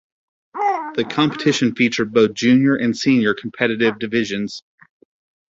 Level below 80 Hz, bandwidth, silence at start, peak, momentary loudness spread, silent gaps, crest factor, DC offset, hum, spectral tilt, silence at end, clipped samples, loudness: -58 dBFS; 7.8 kHz; 0.55 s; -2 dBFS; 9 LU; none; 18 dB; under 0.1%; none; -5 dB/octave; 0.9 s; under 0.1%; -18 LUFS